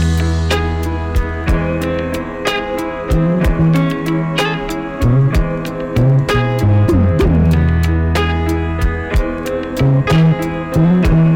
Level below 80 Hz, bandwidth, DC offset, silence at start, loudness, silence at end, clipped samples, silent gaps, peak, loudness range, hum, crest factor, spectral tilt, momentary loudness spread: -22 dBFS; 16.5 kHz; under 0.1%; 0 s; -15 LUFS; 0 s; under 0.1%; none; -6 dBFS; 3 LU; none; 8 dB; -7 dB/octave; 7 LU